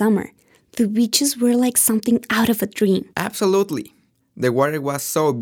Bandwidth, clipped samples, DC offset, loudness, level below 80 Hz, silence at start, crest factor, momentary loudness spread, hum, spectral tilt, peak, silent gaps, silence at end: 19 kHz; under 0.1%; under 0.1%; -19 LUFS; -60 dBFS; 0 s; 18 dB; 8 LU; none; -4 dB/octave; -2 dBFS; none; 0 s